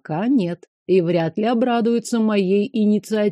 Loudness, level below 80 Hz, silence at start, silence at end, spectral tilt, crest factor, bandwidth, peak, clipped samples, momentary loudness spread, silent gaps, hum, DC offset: -19 LUFS; -70 dBFS; 0.1 s; 0 s; -6.5 dB/octave; 14 dB; 13 kHz; -6 dBFS; under 0.1%; 3 LU; 0.68-0.86 s; none; under 0.1%